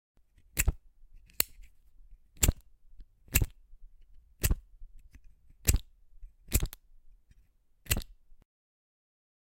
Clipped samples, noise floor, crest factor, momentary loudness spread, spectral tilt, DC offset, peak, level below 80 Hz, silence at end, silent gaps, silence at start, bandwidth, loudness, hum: under 0.1%; -64 dBFS; 32 dB; 12 LU; -3 dB/octave; under 0.1%; -4 dBFS; -38 dBFS; 1.55 s; none; 0.55 s; 16.5 kHz; -32 LUFS; none